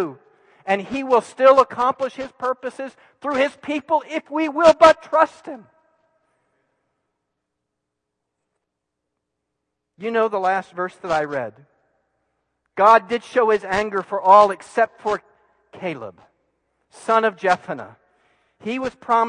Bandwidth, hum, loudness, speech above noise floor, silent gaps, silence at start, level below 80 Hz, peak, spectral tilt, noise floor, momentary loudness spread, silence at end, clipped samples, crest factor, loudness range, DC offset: 10.5 kHz; none; -19 LUFS; 61 dB; none; 0 s; -60 dBFS; 0 dBFS; -4.5 dB/octave; -80 dBFS; 19 LU; 0 s; under 0.1%; 20 dB; 8 LU; under 0.1%